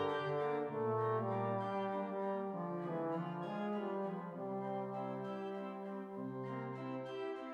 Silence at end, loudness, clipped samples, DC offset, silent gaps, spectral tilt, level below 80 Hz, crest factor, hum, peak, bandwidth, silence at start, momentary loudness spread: 0 s; -41 LUFS; under 0.1%; under 0.1%; none; -8.5 dB/octave; -86 dBFS; 14 dB; none; -26 dBFS; 8.4 kHz; 0 s; 7 LU